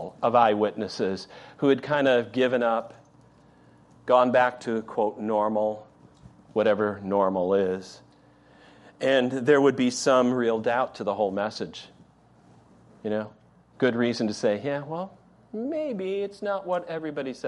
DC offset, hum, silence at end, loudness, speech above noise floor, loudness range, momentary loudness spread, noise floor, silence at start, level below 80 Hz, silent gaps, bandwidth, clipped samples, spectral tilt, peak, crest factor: under 0.1%; none; 0 s; -25 LUFS; 32 dB; 6 LU; 14 LU; -57 dBFS; 0 s; -70 dBFS; none; 11.5 kHz; under 0.1%; -5.5 dB/octave; -6 dBFS; 20 dB